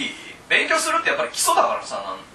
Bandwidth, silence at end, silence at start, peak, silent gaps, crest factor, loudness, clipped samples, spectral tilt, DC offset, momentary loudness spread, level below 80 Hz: 13.5 kHz; 0.05 s; 0 s; -4 dBFS; none; 18 dB; -20 LUFS; under 0.1%; -0.5 dB/octave; under 0.1%; 12 LU; -62 dBFS